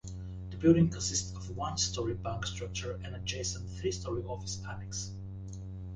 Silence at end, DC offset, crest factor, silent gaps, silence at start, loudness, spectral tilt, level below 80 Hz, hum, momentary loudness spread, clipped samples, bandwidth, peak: 0 s; under 0.1%; 22 dB; none; 0.05 s; -34 LUFS; -4.5 dB/octave; -48 dBFS; none; 16 LU; under 0.1%; 10 kHz; -12 dBFS